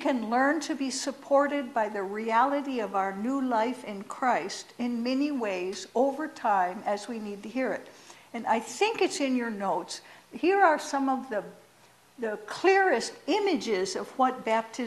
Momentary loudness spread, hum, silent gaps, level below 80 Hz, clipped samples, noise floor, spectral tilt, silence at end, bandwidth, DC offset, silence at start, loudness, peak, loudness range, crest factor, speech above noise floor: 11 LU; none; none; -74 dBFS; under 0.1%; -59 dBFS; -3.5 dB/octave; 0 s; 13.5 kHz; under 0.1%; 0 s; -28 LUFS; -10 dBFS; 3 LU; 18 dB; 31 dB